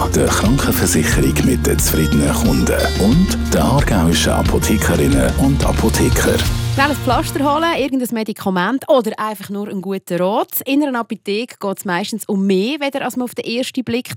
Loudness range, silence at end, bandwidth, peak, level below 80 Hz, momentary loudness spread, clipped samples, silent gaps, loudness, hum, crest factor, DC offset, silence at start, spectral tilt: 5 LU; 0 s; 17 kHz; 0 dBFS; -26 dBFS; 8 LU; under 0.1%; none; -16 LUFS; none; 14 dB; under 0.1%; 0 s; -5 dB/octave